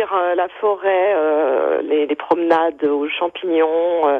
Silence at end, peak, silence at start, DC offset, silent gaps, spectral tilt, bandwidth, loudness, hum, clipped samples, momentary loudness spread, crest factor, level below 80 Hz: 0 s; -4 dBFS; 0 s; under 0.1%; none; -6 dB/octave; 4.7 kHz; -18 LUFS; none; under 0.1%; 4 LU; 14 dB; -66 dBFS